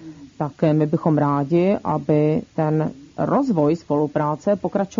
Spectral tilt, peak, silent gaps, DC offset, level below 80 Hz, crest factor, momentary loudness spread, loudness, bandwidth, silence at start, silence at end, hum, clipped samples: -9 dB/octave; -6 dBFS; none; under 0.1%; -56 dBFS; 14 dB; 4 LU; -20 LUFS; 7.4 kHz; 0 s; 0.05 s; none; under 0.1%